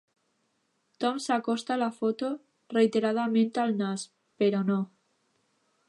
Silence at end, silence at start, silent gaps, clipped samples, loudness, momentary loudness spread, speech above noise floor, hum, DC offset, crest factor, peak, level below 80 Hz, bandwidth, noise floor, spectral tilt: 1 s; 1 s; none; under 0.1%; -28 LUFS; 9 LU; 47 dB; none; under 0.1%; 18 dB; -12 dBFS; -84 dBFS; 11.5 kHz; -75 dBFS; -5.5 dB/octave